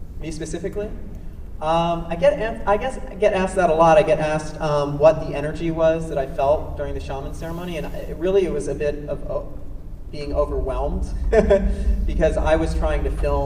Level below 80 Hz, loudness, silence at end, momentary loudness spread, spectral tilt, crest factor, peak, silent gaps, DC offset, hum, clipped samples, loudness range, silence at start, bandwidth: -28 dBFS; -21 LUFS; 0 s; 14 LU; -6.5 dB/octave; 18 dB; -2 dBFS; none; under 0.1%; none; under 0.1%; 6 LU; 0 s; 14 kHz